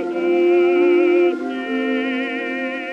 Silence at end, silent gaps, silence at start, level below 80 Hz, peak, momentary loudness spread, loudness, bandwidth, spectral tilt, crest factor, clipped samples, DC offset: 0 s; none; 0 s; -80 dBFS; -6 dBFS; 9 LU; -18 LUFS; 5.8 kHz; -5.5 dB/octave; 12 dB; under 0.1%; under 0.1%